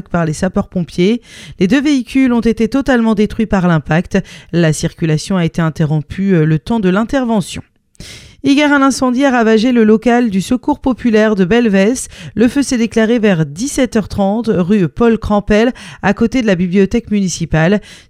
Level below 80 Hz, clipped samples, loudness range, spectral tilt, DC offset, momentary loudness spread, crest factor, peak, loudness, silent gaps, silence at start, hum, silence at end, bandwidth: -34 dBFS; under 0.1%; 3 LU; -6 dB/octave; under 0.1%; 7 LU; 12 dB; 0 dBFS; -13 LUFS; none; 0.1 s; none; 0.15 s; 13 kHz